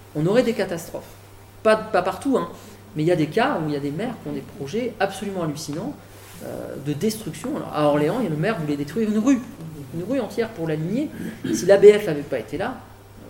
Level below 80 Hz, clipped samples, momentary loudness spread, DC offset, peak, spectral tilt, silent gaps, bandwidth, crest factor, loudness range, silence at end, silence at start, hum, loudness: -54 dBFS; under 0.1%; 14 LU; under 0.1%; 0 dBFS; -6 dB/octave; none; 17 kHz; 22 dB; 7 LU; 0 s; 0 s; none; -22 LUFS